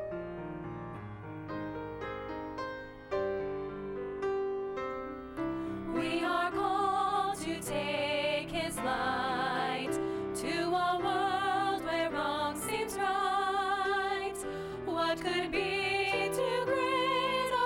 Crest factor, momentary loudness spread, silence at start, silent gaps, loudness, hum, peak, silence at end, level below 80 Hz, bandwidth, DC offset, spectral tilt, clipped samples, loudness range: 14 dB; 10 LU; 0 s; none; -33 LUFS; none; -20 dBFS; 0 s; -58 dBFS; 18 kHz; under 0.1%; -4 dB/octave; under 0.1%; 6 LU